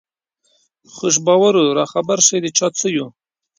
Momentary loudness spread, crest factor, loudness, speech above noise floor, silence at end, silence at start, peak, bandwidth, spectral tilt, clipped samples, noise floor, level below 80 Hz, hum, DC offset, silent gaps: 10 LU; 18 dB; -15 LUFS; 49 dB; 0.5 s; 0.95 s; 0 dBFS; 16 kHz; -3 dB/octave; under 0.1%; -65 dBFS; -64 dBFS; none; under 0.1%; none